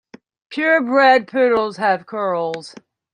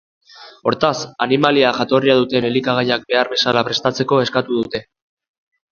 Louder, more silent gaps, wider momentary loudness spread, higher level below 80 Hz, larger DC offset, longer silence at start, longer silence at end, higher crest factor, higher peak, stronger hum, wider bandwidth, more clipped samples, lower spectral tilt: about the same, -17 LUFS vs -17 LUFS; neither; first, 12 LU vs 8 LU; second, -64 dBFS vs -56 dBFS; neither; first, 0.5 s vs 0.35 s; second, 0.45 s vs 0.95 s; about the same, 16 dB vs 18 dB; about the same, -2 dBFS vs 0 dBFS; neither; first, 10 kHz vs 7.2 kHz; neither; about the same, -5 dB/octave vs -5 dB/octave